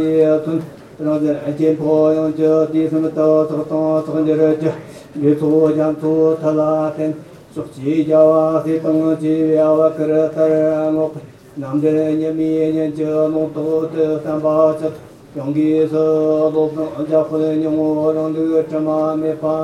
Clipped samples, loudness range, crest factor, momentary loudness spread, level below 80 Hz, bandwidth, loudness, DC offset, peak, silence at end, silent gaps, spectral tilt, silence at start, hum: under 0.1%; 2 LU; 16 dB; 9 LU; -58 dBFS; 9.8 kHz; -16 LUFS; under 0.1%; 0 dBFS; 0 s; none; -9 dB/octave; 0 s; none